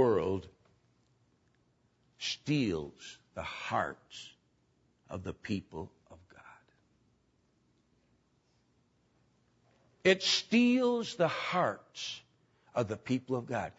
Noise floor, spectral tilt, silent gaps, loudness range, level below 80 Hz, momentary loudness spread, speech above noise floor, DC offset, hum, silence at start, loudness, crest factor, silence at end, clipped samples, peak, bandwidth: -73 dBFS; -4.5 dB/octave; none; 15 LU; -68 dBFS; 19 LU; 40 dB; under 0.1%; none; 0 s; -32 LUFS; 22 dB; 0.05 s; under 0.1%; -12 dBFS; 8 kHz